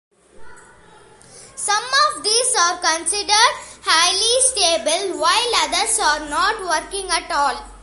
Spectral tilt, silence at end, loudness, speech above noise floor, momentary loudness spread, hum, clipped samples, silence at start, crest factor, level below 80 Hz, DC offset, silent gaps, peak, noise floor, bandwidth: 1 dB/octave; 0 s; -17 LUFS; 29 dB; 8 LU; none; under 0.1%; 0.4 s; 20 dB; -48 dBFS; under 0.1%; none; 0 dBFS; -47 dBFS; 12 kHz